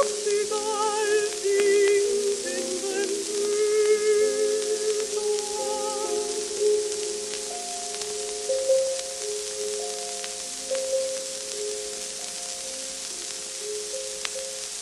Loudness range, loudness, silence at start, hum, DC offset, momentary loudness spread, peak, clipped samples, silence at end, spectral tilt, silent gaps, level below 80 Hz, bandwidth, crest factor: 6 LU; -26 LUFS; 0 s; none; under 0.1%; 9 LU; -6 dBFS; under 0.1%; 0 s; -0.5 dB/octave; none; -64 dBFS; 13 kHz; 22 dB